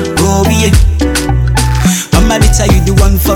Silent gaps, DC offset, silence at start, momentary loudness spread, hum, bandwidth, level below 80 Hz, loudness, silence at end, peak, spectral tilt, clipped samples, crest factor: none; under 0.1%; 0 s; 3 LU; none; 19 kHz; -12 dBFS; -10 LUFS; 0 s; 0 dBFS; -5 dB/octave; under 0.1%; 8 dB